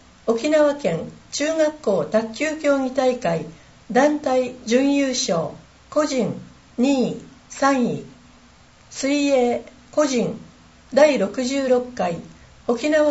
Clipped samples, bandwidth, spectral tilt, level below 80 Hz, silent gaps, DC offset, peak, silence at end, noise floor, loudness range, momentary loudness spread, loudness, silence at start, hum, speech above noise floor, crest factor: under 0.1%; 8 kHz; -4.5 dB/octave; -56 dBFS; none; under 0.1%; -2 dBFS; 0 s; -50 dBFS; 3 LU; 11 LU; -21 LUFS; 0.25 s; none; 30 dB; 18 dB